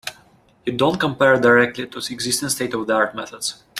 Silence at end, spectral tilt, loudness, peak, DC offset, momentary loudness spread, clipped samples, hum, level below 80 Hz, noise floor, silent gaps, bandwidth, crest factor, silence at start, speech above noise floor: 0 s; -3.5 dB/octave; -19 LUFS; -2 dBFS; under 0.1%; 13 LU; under 0.1%; none; -56 dBFS; -54 dBFS; none; 16 kHz; 18 dB; 0.05 s; 34 dB